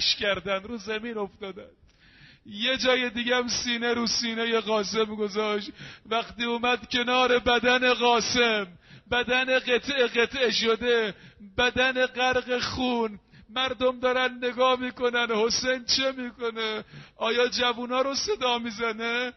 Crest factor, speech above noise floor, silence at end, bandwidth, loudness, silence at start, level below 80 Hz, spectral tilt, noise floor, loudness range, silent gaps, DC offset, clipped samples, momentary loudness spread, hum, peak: 18 dB; 28 dB; 0.05 s; 6.2 kHz; -25 LUFS; 0 s; -56 dBFS; -0.5 dB/octave; -54 dBFS; 4 LU; none; under 0.1%; under 0.1%; 10 LU; none; -10 dBFS